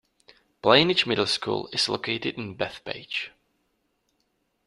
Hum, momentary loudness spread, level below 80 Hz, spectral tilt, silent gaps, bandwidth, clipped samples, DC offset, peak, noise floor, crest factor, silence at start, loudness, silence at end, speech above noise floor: none; 13 LU; -64 dBFS; -4 dB/octave; none; 13 kHz; under 0.1%; under 0.1%; -2 dBFS; -73 dBFS; 26 dB; 0.65 s; -24 LUFS; 1.4 s; 48 dB